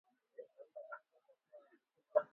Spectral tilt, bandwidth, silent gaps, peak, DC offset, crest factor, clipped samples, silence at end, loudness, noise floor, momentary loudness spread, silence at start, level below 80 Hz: -3 dB/octave; 3.5 kHz; none; -18 dBFS; under 0.1%; 28 dB; under 0.1%; 0.1 s; -44 LUFS; -75 dBFS; 26 LU; 0.4 s; under -90 dBFS